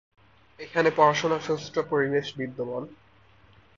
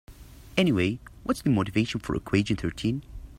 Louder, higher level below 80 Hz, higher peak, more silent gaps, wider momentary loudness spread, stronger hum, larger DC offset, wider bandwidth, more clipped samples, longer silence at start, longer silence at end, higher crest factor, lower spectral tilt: about the same, -26 LUFS vs -27 LUFS; second, -66 dBFS vs -46 dBFS; about the same, -6 dBFS vs -6 dBFS; neither; first, 15 LU vs 7 LU; neither; neither; second, 7.4 kHz vs 16 kHz; neither; first, 0.6 s vs 0.1 s; first, 0.85 s vs 0 s; about the same, 22 dB vs 22 dB; second, -5 dB/octave vs -6.5 dB/octave